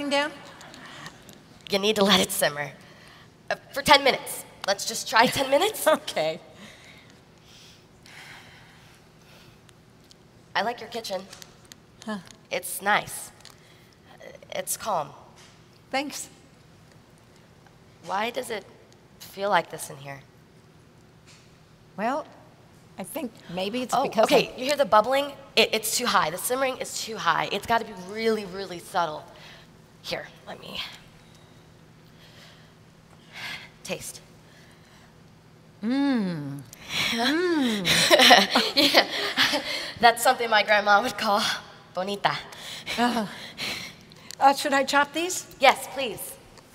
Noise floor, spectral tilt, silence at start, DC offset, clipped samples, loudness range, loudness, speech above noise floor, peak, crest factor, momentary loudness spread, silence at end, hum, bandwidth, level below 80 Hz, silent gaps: -54 dBFS; -2.5 dB/octave; 0 s; under 0.1%; under 0.1%; 18 LU; -24 LUFS; 29 dB; -2 dBFS; 26 dB; 22 LU; 0.15 s; none; 16 kHz; -62 dBFS; none